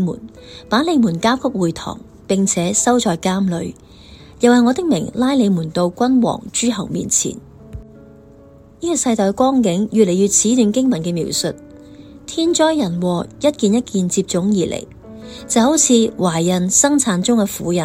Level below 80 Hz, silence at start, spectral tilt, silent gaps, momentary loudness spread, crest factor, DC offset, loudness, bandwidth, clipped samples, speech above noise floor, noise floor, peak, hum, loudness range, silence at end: -46 dBFS; 0 s; -4.5 dB/octave; none; 16 LU; 16 dB; under 0.1%; -16 LUFS; 16 kHz; under 0.1%; 27 dB; -43 dBFS; 0 dBFS; none; 3 LU; 0 s